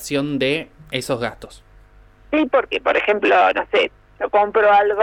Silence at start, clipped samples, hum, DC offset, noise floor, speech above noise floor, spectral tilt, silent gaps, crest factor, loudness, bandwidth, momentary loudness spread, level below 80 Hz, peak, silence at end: 0 s; under 0.1%; 50 Hz at -60 dBFS; under 0.1%; -48 dBFS; 30 dB; -4.5 dB/octave; none; 14 dB; -18 LUFS; 16 kHz; 11 LU; -50 dBFS; -4 dBFS; 0 s